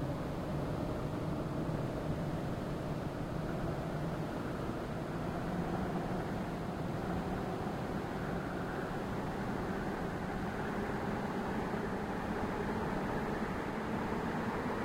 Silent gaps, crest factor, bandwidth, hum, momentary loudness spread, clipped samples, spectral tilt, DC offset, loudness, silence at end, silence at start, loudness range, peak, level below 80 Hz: none; 14 dB; 16 kHz; none; 2 LU; under 0.1%; -7 dB/octave; under 0.1%; -38 LUFS; 0 s; 0 s; 1 LU; -24 dBFS; -50 dBFS